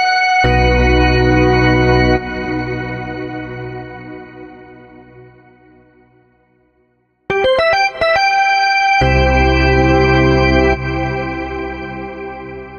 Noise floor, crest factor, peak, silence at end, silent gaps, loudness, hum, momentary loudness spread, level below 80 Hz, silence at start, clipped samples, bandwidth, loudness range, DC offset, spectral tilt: -60 dBFS; 12 dB; -2 dBFS; 0 s; none; -13 LUFS; none; 16 LU; -24 dBFS; 0 s; under 0.1%; 6.6 kHz; 17 LU; under 0.1%; -6 dB/octave